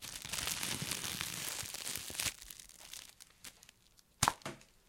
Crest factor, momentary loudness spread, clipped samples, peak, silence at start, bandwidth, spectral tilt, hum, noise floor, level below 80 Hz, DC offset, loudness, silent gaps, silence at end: 32 dB; 18 LU; under 0.1%; -10 dBFS; 0 s; 17 kHz; -1 dB/octave; none; -68 dBFS; -62 dBFS; under 0.1%; -38 LUFS; none; 0.2 s